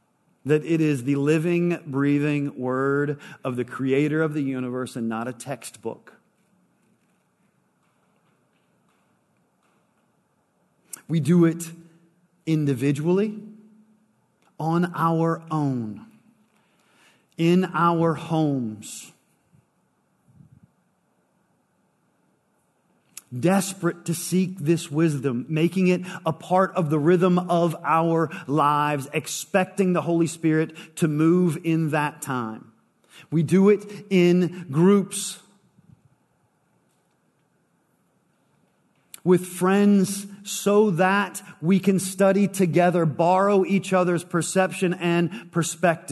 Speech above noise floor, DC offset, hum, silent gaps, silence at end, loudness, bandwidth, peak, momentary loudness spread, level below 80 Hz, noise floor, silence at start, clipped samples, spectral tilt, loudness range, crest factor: 46 dB; under 0.1%; none; none; 0 s; -23 LUFS; 12.5 kHz; -6 dBFS; 12 LU; -74 dBFS; -68 dBFS; 0.45 s; under 0.1%; -6.5 dB/octave; 9 LU; 18 dB